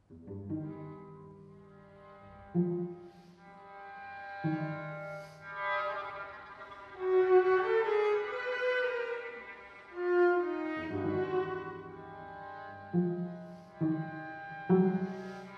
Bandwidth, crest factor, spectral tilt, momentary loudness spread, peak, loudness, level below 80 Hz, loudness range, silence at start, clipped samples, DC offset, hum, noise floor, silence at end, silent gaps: 6.4 kHz; 20 dB; -8.5 dB/octave; 21 LU; -14 dBFS; -33 LUFS; -72 dBFS; 10 LU; 0.1 s; under 0.1%; under 0.1%; none; -55 dBFS; 0 s; none